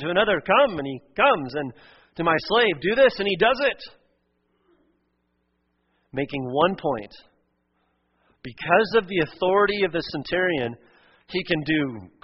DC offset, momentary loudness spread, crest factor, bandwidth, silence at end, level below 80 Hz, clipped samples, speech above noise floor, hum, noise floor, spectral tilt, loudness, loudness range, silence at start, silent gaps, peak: under 0.1%; 13 LU; 20 dB; 6 kHz; 0.15 s; -54 dBFS; under 0.1%; 49 dB; none; -72 dBFS; -2.5 dB/octave; -22 LUFS; 8 LU; 0 s; none; -4 dBFS